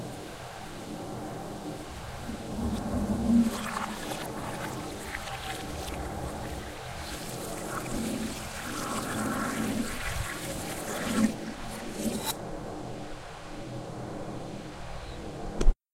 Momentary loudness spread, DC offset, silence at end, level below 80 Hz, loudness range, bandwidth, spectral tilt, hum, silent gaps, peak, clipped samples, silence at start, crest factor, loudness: 11 LU; under 0.1%; 0.2 s; -38 dBFS; 6 LU; 16 kHz; -4.5 dB/octave; none; none; -8 dBFS; under 0.1%; 0 s; 24 dB; -34 LUFS